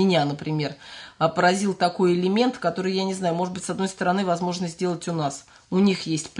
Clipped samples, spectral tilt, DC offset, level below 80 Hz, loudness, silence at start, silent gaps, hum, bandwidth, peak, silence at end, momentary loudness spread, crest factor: under 0.1%; -5.5 dB/octave; under 0.1%; -64 dBFS; -24 LUFS; 0 s; none; none; 11 kHz; -6 dBFS; 0 s; 7 LU; 16 dB